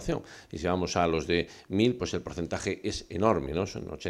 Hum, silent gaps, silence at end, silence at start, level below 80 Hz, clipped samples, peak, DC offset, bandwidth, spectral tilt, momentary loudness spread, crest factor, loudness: none; none; 0 s; 0 s; -50 dBFS; under 0.1%; -10 dBFS; under 0.1%; 13 kHz; -5.5 dB/octave; 8 LU; 20 dB; -30 LUFS